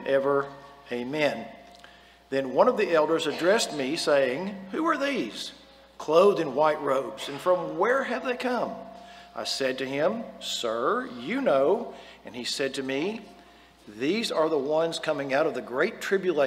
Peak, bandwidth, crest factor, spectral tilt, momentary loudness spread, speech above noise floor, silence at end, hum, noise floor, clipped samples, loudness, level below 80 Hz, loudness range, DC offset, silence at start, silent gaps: -6 dBFS; 16 kHz; 20 dB; -4 dB/octave; 13 LU; 27 dB; 0 s; none; -53 dBFS; under 0.1%; -26 LUFS; -66 dBFS; 4 LU; under 0.1%; 0 s; none